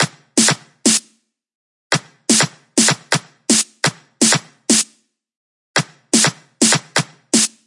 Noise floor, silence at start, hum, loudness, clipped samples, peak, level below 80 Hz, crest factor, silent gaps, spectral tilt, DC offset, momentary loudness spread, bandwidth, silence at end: -59 dBFS; 0 s; none; -16 LUFS; under 0.1%; 0 dBFS; -74 dBFS; 18 dB; 1.55-1.90 s, 5.37-5.74 s; -2 dB/octave; under 0.1%; 6 LU; 11.5 kHz; 0.2 s